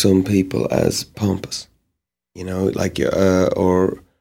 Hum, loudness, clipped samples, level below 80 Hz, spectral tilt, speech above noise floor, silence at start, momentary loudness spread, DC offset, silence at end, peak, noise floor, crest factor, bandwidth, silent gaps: none; -19 LUFS; under 0.1%; -46 dBFS; -6 dB/octave; 59 dB; 0 s; 11 LU; under 0.1%; 0.2 s; -2 dBFS; -77 dBFS; 18 dB; 16.5 kHz; none